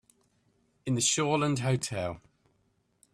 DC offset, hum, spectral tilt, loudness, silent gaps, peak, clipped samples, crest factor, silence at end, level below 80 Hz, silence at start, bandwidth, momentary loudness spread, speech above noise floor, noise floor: under 0.1%; none; -4 dB/octave; -29 LUFS; none; -12 dBFS; under 0.1%; 20 dB; 0.95 s; -64 dBFS; 0.85 s; 14 kHz; 14 LU; 44 dB; -72 dBFS